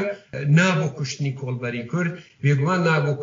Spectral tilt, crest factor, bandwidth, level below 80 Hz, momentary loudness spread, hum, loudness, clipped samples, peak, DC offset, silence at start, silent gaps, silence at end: -6 dB/octave; 14 dB; 7.6 kHz; -62 dBFS; 11 LU; none; -22 LUFS; under 0.1%; -8 dBFS; under 0.1%; 0 s; none; 0 s